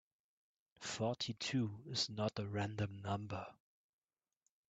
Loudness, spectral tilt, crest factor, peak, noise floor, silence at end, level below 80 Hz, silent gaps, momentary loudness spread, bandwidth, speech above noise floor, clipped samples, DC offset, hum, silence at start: -41 LUFS; -4.5 dB/octave; 20 dB; -24 dBFS; -87 dBFS; 1.15 s; -74 dBFS; none; 9 LU; 9 kHz; 46 dB; under 0.1%; under 0.1%; none; 0.8 s